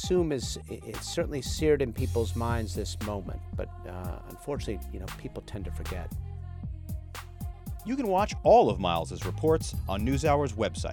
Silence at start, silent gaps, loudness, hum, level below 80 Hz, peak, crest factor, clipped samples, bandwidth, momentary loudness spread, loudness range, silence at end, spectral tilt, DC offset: 0 s; none; -30 LUFS; none; -42 dBFS; -10 dBFS; 20 dB; under 0.1%; 18 kHz; 14 LU; 12 LU; 0 s; -6 dB/octave; under 0.1%